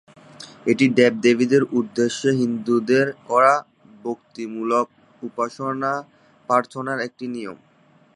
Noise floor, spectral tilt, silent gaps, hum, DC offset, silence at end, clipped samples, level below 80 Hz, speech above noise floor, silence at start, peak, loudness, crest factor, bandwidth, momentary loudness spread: -56 dBFS; -5.5 dB/octave; none; none; under 0.1%; 0.6 s; under 0.1%; -70 dBFS; 36 dB; 0.4 s; -2 dBFS; -21 LUFS; 20 dB; 11 kHz; 16 LU